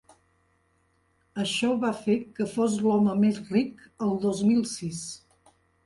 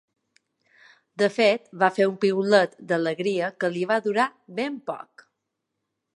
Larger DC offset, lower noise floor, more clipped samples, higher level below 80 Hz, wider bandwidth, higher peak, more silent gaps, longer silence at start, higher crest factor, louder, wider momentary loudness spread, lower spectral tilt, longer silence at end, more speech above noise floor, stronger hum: neither; second, -68 dBFS vs -81 dBFS; neither; first, -66 dBFS vs -80 dBFS; about the same, 11.5 kHz vs 11 kHz; second, -12 dBFS vs -4 dBFS; neither; first, 1.35 s vs 1.2 s; second, 16 dB vs 22 dB; about the same, -26 LUFS vs -24 LUFS; about the same, 12 LU vs 11 LU; about the same, -5.5 dB/octave vs -5.5 dB/octave; second, 0.7 s vs 1.15 s; second, 43 dB vs 57 dB; neither